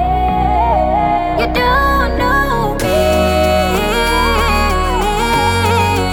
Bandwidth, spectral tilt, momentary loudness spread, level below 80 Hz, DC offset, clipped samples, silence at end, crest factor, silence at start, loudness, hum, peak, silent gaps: 19.5 kHz; -5 dB/octave; 3 LU; -22 dBFS; under 0.1%; under 0.1%; 0 s; 12 dB; 0 s; -13 LUFS; none; -2 dBFS; none